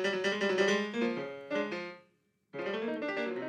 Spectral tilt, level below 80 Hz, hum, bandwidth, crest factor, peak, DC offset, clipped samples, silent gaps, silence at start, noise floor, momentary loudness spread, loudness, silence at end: -4.5 dB/octave; -82 dBFS; none; 10 kHz; 18 dB; -16 dBFS; under 0.1%; under 0.1%; none; 0 s; -72 dBFS; 12 LU; -33 LUFS; 0 s